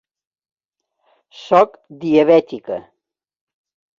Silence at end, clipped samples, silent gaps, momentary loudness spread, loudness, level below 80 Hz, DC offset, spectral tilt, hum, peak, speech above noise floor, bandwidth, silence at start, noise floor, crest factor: 1.2 s; under 0.1%; none; 16 LU; -15 LUFS; -64 dBFS; under 0.1%; -7 dB/octave; none; -2 dBFS; 62 dB; 7.2 kHz; 1.4 s; -78 dBFS; 18 dB